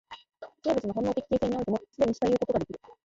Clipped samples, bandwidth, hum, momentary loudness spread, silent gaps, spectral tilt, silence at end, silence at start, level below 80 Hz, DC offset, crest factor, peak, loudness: under 0.1%; 7.8 kHz; none; 16 LU; none; -7 dB/octave; 0.15 s; 0.1 s; -56 dBFS; under 0.1%; 16 dB; -12 dBFS; -29 LUFS